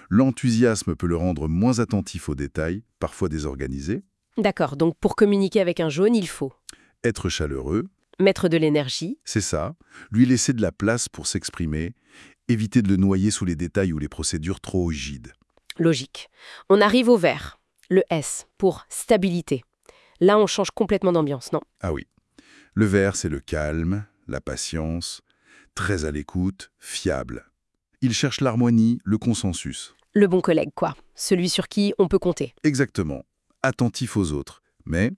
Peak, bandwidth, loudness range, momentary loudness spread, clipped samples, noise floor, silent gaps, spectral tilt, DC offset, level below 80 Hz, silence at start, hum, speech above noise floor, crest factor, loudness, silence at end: -4 dBFS; 12 kHz; 5 LU; 13 LU; under 0.1%; -72 dBFS; none; -5.5 dB/octave; under 0.1%; -44 dBFS; 0.1 s; none; 50 dB; 18 dB; -23 LUFS; 0 s